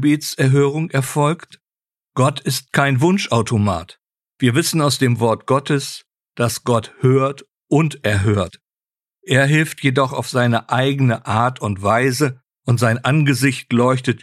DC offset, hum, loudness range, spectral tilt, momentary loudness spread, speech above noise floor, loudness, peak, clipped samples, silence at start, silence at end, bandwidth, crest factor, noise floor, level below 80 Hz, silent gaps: under 0.1%; none; 2 LU; -5.5 dB/octave; 6 LU; over 73 dB; -17 LUFS; -2 dBFS; under 0.1%; 0 s; 0.05 s; 14 kHz; 16 dB; under -90 dBFS; -54 dBFS; none